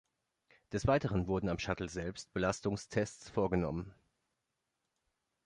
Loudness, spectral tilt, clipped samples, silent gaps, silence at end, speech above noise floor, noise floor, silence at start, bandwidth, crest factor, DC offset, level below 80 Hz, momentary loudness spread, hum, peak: -36 LUFS; -6 dB/octave; under 0.1%; none; 1.55 s; 51 dB; -86 dBFS; 0.7 s; 11 kHz; 20 dB; under 0.1%; -54 dBFS; 9 LU; none; -18 dBFS